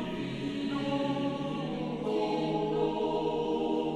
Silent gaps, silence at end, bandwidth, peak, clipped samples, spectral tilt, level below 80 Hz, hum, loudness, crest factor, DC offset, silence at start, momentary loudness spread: none; 0 s; 10.5 kHz; -18 dBFS; under 0.1%; -7 dB/octave; -58 dBFS; none; -32 LUFS; 14 dB; under 0.1%; 0 s; 4 LU